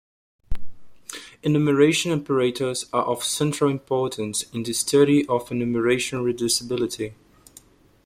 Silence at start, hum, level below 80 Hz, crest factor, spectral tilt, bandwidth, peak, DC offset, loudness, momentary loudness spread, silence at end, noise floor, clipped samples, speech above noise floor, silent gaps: 0.5 s; none; -44 dBFS; 18 dB; -4.5 dB/octave; 15.5 kHz; -6 dBFS; under 0.1%; -22 LUFS; 19 LU; 0.9 s; -52 dBFS; under 0.1%; 30 dB; none